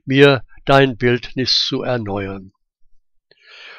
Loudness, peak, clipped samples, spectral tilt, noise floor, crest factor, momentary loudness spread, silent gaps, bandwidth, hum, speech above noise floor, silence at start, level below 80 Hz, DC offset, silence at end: -16 LUFS; 0 dBFS; under 0.1%; -5.5 dB/octave; -55 dBFS; 18 dB; 13 LU; none; 9.4 kHz; none; 40 dB; 0.05 s; -42 dBFS; under 0.1%; 0.05 s